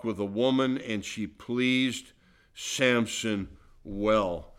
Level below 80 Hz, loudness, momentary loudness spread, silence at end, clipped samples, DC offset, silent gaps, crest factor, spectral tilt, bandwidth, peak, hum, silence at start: -54 dBFS; -28 LUFS; 13 LU; 0.15 s; under 0.1%; under 0.1%; none; 16 dB; -4 dB/octave; 15 kHz; -12 dBFS; none; 0.05 s